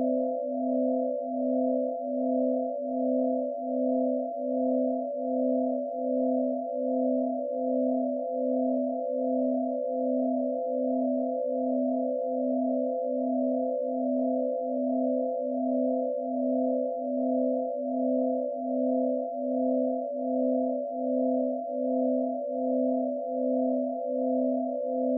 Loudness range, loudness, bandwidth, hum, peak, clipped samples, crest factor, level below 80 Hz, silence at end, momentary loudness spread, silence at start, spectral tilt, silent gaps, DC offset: 0 LU; -29 LUFS; 0.8 kHz; none; -16 dBFS; under 0.1%; 12 dB; under -90 dBFS; 0 s; 3 LU; 0 s; 5 dB/octave; none; under 0.1%